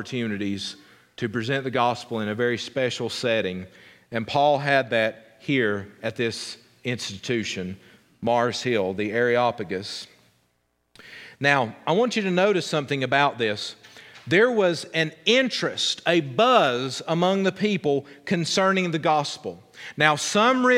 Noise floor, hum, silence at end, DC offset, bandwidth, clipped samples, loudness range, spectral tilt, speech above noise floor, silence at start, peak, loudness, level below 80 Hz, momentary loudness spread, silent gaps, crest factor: -71 dBFS; none; 0 s; under 0.1%; 15.5 kHz; under 0.1%; 5 LU; -4.5 dB/octave; 47 dB; 0 s; -2 dBFS; -23 LUFS; -68 dBFS; 14 LU; none; 22 dB